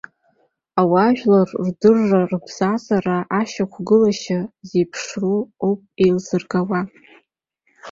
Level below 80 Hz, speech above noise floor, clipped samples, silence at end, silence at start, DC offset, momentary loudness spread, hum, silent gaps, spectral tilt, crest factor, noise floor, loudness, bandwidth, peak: -58 dBFS; 50 dB; under 0.1%; 0 s; 0.75 s; under 0.1%; 9 LU; none; none; -6.5 dB/octave; 18 dB; -68 dBFS; -19 LUFS; 7.6 kHz; -2 dBFS